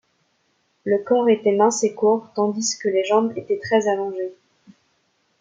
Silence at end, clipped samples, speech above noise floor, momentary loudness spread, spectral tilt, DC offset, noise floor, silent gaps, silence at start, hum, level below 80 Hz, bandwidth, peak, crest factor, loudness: 1.05 s; under 0.1%; 47 dB; 9 LU; -4 dB/octave; under 0.1%; -67 dBFS; none; 0.85 s; none; -72 dBFS; 9.4 kHz; -4 dBFS; 18 dB; -20 LUFS